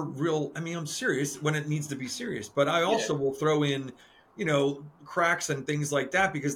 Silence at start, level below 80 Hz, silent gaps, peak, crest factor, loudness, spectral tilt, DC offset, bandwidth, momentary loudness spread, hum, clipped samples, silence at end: 0 s; -66 dBFS; none; -12 dBFS; 18 dB; -28 LUFS; -4.5 dB/octave; under 0.1%; 16.5 kHz; 9 LU; none; under 0.1%; 0 s